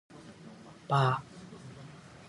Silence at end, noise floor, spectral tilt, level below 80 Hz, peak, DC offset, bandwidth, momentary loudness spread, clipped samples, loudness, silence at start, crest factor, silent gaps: 0.3 s; -51 dBFS; -6.5 dB/octave; -68 dBFS; -14 dBFS; under 0.1%; 11 kHz; 23 LU; under 0.1%; -30 LUFS; 0.2 s; 22 dB; none